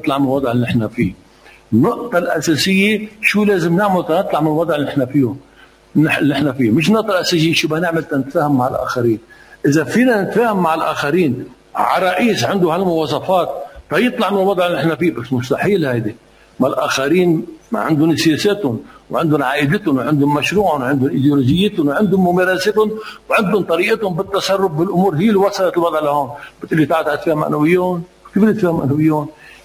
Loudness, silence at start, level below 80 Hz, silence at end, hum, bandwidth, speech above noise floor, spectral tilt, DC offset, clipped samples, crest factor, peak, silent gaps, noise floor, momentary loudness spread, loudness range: -16 LUFS; 0 s; -48 dBFS; 0.15 s; none; 16 kHz; 29 dB; -6 dB/octave; under 0.1%; under 0.1%; 16 dB; 0 dBFS; none; -45 dBFS; 6 LU; 2 LU